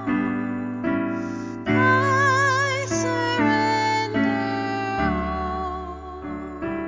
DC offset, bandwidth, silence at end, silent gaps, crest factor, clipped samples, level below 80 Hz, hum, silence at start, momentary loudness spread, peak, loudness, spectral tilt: under 0.1%; 7.6 kHz; 0 s; none; 16 dB; under 0.1%; -42 dBFS; none; 0 s; 13 LU; -8 dBFS; -22 LUFS; -5 dB/octave